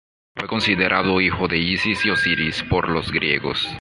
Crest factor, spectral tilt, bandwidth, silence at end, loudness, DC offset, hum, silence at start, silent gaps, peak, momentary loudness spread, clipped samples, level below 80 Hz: 18 dB; -5 dB/octave; 11.5 kHz; 0 s; -19 LUFS; under 0.1%; none; 0.35 s; none; -2 dBFS; 5 LU; under 0.1%; -42 dBFS